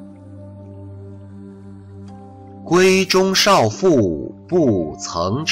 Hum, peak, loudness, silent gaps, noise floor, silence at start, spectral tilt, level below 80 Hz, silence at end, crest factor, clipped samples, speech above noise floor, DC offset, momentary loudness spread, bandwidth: none; -4 dBFS; -16 LUFS; none; -38 dBFS; 0 s; -4.5 dB/octave; -48 dBFS; 0 s; 14 dB; under 0.1%; 22 dB; under 0.1%; 25 LU; 16 kHz